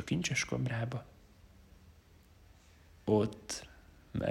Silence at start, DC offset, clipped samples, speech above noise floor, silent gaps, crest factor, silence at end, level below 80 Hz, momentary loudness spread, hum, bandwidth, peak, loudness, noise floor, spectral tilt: 0 s; under 0.1%; under 0.1%; 27 dB; none; 22 dB; 0 s; -60 dBFS; 12 LU; none; 16 kHz; -16 dBFS; -35 LUFS; -61 dBFS; -5 dB/octave